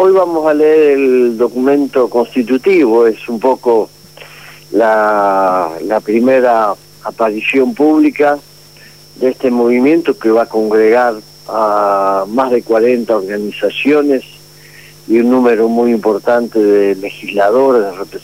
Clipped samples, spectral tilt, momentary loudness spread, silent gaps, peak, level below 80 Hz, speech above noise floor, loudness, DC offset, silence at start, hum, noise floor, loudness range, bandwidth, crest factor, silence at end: under 0.1%; -6 dB/octave; 7 LU; none; 0 dBFS; -56 dBFS; 28 dB; -12 LUFS; 0.3%; 0 s; 50 Hz at -45 dBFS; -39 dBFS; 2 LU; 16 kHz; 10 dB; 0.05 s